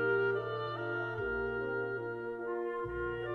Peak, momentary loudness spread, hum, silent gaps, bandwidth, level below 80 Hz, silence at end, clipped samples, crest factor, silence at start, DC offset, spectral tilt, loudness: -20 dBFS; 6 LU; none; none; 6 kHz; -56 dBFS; 0 s; under 0.1%; 14 dB; 0 s; under 0.1%; -8 dB/octave; -36 LUFS